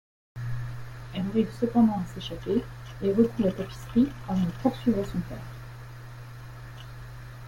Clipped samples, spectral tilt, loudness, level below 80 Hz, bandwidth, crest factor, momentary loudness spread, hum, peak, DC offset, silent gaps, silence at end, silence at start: under 0.1%; -8 dB/octave; -28 LUFS; -48 dBFS; 16.5 kHz; 20 dB; 19 LU; none; -10 dBFS; under 0.1%; none; 0 s; 0.35 s